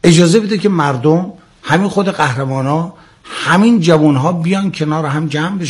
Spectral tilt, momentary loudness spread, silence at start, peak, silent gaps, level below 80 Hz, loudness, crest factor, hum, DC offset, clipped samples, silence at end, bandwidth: -6 dB/octave; 9 LU; 0.05 s; 0 dBFS; none; -50 dBFS; -13 LUFS; 12 dB; none; under 0.1%; 0.1%; 0 s; 12 kHz